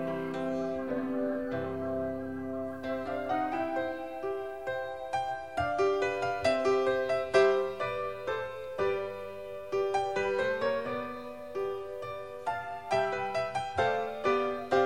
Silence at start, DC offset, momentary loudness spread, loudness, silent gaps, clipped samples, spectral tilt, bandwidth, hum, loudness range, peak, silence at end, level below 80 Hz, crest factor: 0 s; 0.2%; 9 LU; -32 LUFS; none; under 0.1%; -5.5 dB/octave; 13 kHz; none; 5 LU; -12 dBFS; 0 s; -62 dBFS; 20 dB